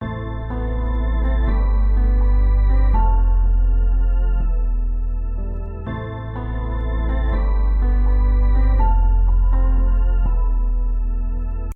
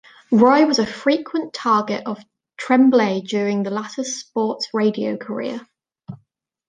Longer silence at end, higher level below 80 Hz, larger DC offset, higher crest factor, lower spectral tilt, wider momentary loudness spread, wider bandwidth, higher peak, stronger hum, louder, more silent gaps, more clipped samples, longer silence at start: second, 0 s vs 0.55 s; first, -16 dBFS vs -66 dBFS; neither; second, 10 dB vs 18 dB; first, -10 dB/octave vs -5 dB/octave; second, 9 LU vs 18 LU; second, 3.7 kHz vs 9.6 kHz; second, -6 dBFS vs -2 dBFS; neither; about the same, -21 LUFS vs -19 LUFS; neither; neither; second, 0 s vs 0.3 s